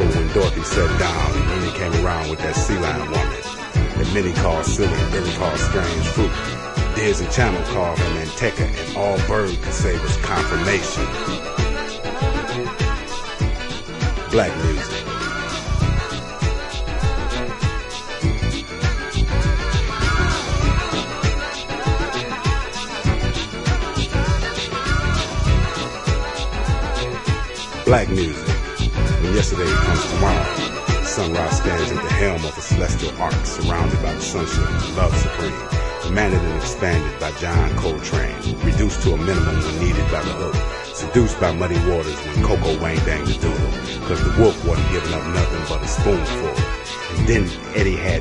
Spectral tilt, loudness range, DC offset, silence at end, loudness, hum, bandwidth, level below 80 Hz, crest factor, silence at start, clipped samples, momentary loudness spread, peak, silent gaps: -5 dB/octave; 3 LU; under 0.1%; 0 s; -21 LUFS; none; 11 kHz; -26 dBFS; 16 dB; 0 s; under 0.1%; 6 LU; -2 dBFS; none